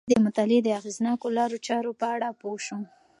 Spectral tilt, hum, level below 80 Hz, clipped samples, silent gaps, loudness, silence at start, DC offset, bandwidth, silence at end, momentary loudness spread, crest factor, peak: -5 dB/octave; none; -66 dBFS; under 0.1%; none; -27 LUFS; 0.05 s; under 0.1%; 11 kHz; 0.35 s; 12 LU; 18 dB; -8 dBFS